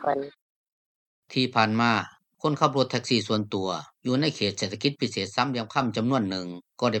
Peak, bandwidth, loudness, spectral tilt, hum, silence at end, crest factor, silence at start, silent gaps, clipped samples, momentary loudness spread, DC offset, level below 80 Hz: -4 dBFS; 9 kHz; -26 LUFS; -5 dB/octave; none; 0 s; 22 dB; 0 s; 0.42-0.66 s, 0.72-1.22 s; under 0.1%; 8 LU; under 0.1%; -70 dBFS